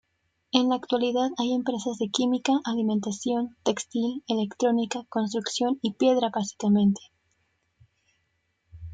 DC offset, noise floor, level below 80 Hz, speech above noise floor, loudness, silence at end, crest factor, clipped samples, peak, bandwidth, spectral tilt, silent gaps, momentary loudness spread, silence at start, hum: under 0.1%; -74 dBFS; -64 dBFS; 49 dB; -26 LUFS; 0 s; 24 dB; under 0.1%; -4 dBFS; 9.4 kHz; -5 dB/octave; none; 6 LU; 0.55 s; none